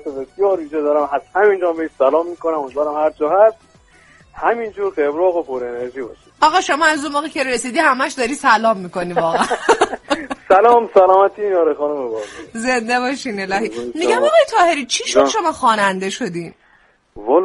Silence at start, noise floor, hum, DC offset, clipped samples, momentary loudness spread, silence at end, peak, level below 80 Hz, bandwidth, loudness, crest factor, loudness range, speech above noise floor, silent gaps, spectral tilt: 0.05 s; -54 dBFS; none; under 0.1%; under 0.1%; 11 LU; 0 s; 0 dBFS; -54 dBFS; 11.5 kHz; -16 LUFS; 16 dB; 4 LU; 38 dB; none; -3.5 dB/octave